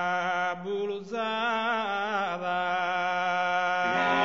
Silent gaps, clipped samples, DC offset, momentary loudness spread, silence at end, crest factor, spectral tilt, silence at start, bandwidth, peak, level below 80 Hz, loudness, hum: none; under 0.1%; 0.1%; 6 LU; 0 s; 16 dB; -4 dB/octave; 0 s; 7.4 kHz; -12 dBFS; -72 dBFS; -28 LUFS; none